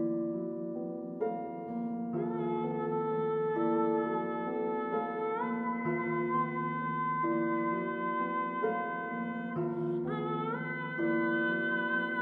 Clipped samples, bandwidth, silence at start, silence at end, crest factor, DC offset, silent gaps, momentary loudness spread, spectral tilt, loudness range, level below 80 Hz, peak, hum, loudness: under 0.1%; 4.3 kHz; 0 s; 0 s; 14 dB; under 0.1%; none; 6 LU; -9.5 dB/octave; 2 LU; -78 dBFS; -20 dBFS; none; -33 LUFS